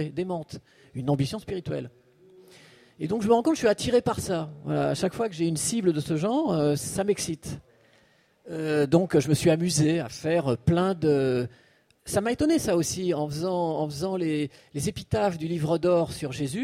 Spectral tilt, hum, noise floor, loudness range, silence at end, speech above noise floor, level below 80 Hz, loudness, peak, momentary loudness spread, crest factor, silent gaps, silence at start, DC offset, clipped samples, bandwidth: -5.5 dB/octave; none; -62 dBFS; 4 LU; 0 s; 37 dB; -54 dBFS; -26 LUFS; -8 dBFS; 11 LU; 18 dB; none; 0 s; under 0.1%; under 0.1%; 16 kHz